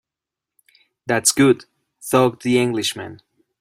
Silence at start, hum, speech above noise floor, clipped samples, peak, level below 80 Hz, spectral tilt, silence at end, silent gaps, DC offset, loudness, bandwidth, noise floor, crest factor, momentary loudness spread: 1.05 s; none; 69 dB; under 0.1%; -2 dBFS; -60 dBFS; -4 dB/octave; 0.45 s; none; under 0.1%; -18 LUFS; 16 kHz; -86 dBFS; 20 dB; 20 LU